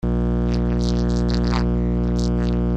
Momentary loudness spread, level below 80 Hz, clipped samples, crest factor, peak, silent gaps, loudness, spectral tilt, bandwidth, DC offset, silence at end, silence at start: 1 LU; -24 dBFS; under 0.1%; 12 dB; -8 dBFS; none; -21 LUFS; -7.5 dB/octave; 8.2 kHz; under 0.1%; 0 s; 0.05 s